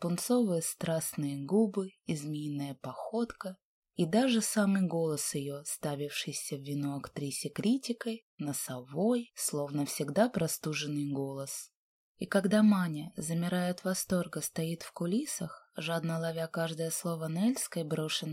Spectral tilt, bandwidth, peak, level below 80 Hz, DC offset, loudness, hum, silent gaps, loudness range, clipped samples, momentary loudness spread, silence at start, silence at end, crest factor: -5 dB/octave; 16 kHz; -12 dBFS; -70 dBFS; under 0.1%; -33 LUFS; none; 3.63-3.82 s, 8.22-8.38 s, 11.75-12.15 s; 3 LU; under 0.1%; 10 LU; 0 s; 0 s; 20 dB